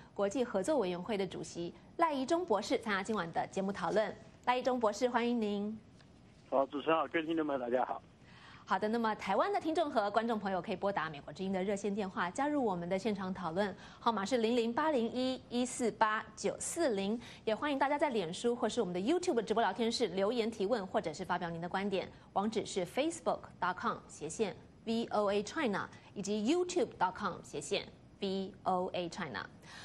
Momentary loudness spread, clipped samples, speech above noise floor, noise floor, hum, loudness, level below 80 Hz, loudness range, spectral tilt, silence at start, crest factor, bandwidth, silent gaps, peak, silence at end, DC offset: 7 LU; under 0.1%; 25 dB; -60 dBFS; none; -35 LUFS; -68 dBFS; 3 LU; -4.5 dB/octave; 0 s; 20 dB; 12.5 kHz; none; -16 dBFS; 0 s; under 0.1%